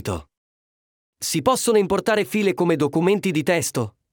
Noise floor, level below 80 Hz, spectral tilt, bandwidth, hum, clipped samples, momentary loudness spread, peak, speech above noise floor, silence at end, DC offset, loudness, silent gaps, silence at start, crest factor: under -90 dBFS; -54 dBFS; -4.5 dB/octave; 20 kHz; none; under 0.1%; 10 LU; -6 dBFS; over 70 dB; 0.25 s; under 0.1%; -21 LUFS; 0.37-1.13 s; 0.05 s; 16 dB